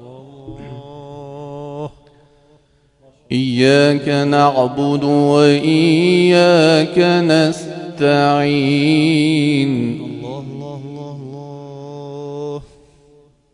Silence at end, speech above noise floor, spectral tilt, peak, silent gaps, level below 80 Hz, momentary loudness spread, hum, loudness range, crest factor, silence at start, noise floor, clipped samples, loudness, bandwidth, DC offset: 0.9 s; 42 dB; -6 dB/octave; 0 dBFS; none; -54 dBFS; 21 LU; none; 17 LU; 16 dB; 0 s; -54 dBFS; under 0.1%; -14 LUFS; 11 kHz; under 0.1%